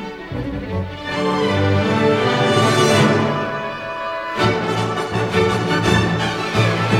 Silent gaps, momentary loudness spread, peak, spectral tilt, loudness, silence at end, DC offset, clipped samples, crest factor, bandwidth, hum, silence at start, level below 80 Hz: none; 11 LU; -2 dBFS; -5.5 dB/octave; -18 LUFS; 0 s; under 0.1%; under 0.1%; 16 dB; 15 kHz; none; 0 s; -42 dBFS